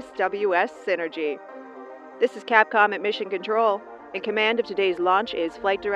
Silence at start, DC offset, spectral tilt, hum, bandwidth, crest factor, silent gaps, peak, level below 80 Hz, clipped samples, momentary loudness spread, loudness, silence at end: 0 s; under 0.1%; -4.5 dB/octave; none; 9.2 kHz; 22 dB; none; -2 dBFS; -66 dBFS; under 0.1%; 16 LU; -23 LUFS; 0 s